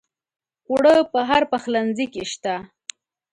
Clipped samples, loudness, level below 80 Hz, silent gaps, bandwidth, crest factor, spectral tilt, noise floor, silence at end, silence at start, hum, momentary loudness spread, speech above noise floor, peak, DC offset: under 0.1%; -20 LUFS; -58 dBFS; none; 11.5 kHz; 16 dB; -4 dB/octave; -42 dBFS; 0.7 s; 0.7 s; none; 19 LU; 22 dB; -4 dBFS; under 0.1%